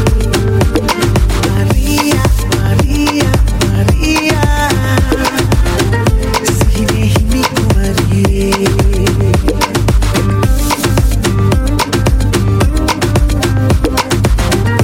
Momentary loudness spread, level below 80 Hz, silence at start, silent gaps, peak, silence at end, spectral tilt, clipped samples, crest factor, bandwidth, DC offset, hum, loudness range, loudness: 1 LU; -16 dBFS; 0 s; none; 0 dBFS; 0 s; -5.5 dB/octave; under 0.1%; 10 dB; 17 kHz; under 0.1%; none; 1 LU; -12 LUFS